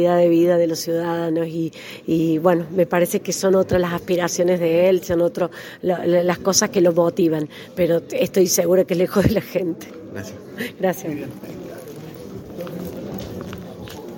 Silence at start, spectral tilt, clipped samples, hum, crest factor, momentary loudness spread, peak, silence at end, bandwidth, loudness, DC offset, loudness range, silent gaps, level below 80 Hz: 0 s; -5 dB/octave; under 0.1%; none; 20 dB; 18 LU; 0 dBFS; 0 s; 17 kHz; -19 LUFS; under 0.1%; 11 LU; none; -48 dBFS